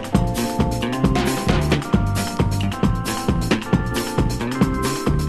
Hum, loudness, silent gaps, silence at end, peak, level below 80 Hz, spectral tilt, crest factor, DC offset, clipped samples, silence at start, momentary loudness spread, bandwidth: none; -21 LUFS; none; 0 s; -2 dBFS; -28 dBFS; -5.5 dB/octave; 18 dB; 0.6%; under 0.1%; 0 s; 3 LU; 13.5 kHz